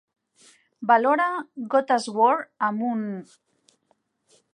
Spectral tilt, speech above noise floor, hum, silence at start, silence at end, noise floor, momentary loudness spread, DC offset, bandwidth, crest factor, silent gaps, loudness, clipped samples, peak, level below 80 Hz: -5 dB/octave; 47 dB; none; 0.8 s; 1.35 s; -70 dBFS; 13 LU; under 0.1%; 11 kHz; 20 dB; none; -23 LUFS; under 0.1%; -6 dBFS; -86 dBFS